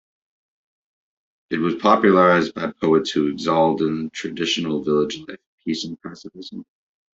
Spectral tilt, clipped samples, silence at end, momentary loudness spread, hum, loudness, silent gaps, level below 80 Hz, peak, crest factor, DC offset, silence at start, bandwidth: -5.5 dB/octave; under 0.1%; 0.55 s; 21 LU; none; -20 LUFS; 5.47-5.58 s; -60 dBFS; -2 dBFS; 20 dB; under 0.1%; 1.5 s; 8 kHz